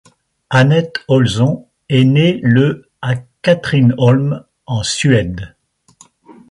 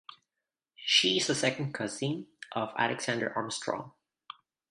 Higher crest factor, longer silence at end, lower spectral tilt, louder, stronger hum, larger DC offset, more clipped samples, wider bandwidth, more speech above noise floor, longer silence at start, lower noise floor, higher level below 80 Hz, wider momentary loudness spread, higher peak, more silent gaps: second, 14 dB vs 22 dB; second, 0.2 s vs 0.8 s; first, -6.5 dB/octave vs -3 dB/octave; first, -14 LUFS vs -30 LUFS; neither; neither; neither; about the same, 11.5 kHz vs 11.5 kHz; second, 36 dB vs 58 dB; first, 0.5 s vs 0.1 s; second, -49 dBFS vs -89 dBFS; first, -44 dBFS vs -74 dBFS; second, 12 LU vs 26 LU; first, 0 dBFS vs -10 dBFS; neither